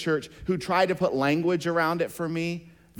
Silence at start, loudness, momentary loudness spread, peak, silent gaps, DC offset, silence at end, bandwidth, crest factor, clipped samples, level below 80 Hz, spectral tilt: 0 s; -26 LUFS; 7 LU; -12 dBFS; none; under 0.1%; 0.3 s; 19 kHz; 14 dB; under 0.1%; -56 dBFS; -6 dB/octave